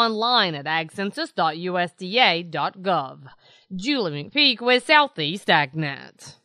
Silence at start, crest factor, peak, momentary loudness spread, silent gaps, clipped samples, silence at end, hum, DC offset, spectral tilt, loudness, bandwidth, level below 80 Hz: 0 s; 22 dB; -2 dBFS; 12 LU; none; under 0.1%; 0.1 s; none; under 0.1%; -4.5 dB/octave; -21 LUFS; 12.5 kHz; -72 dBFS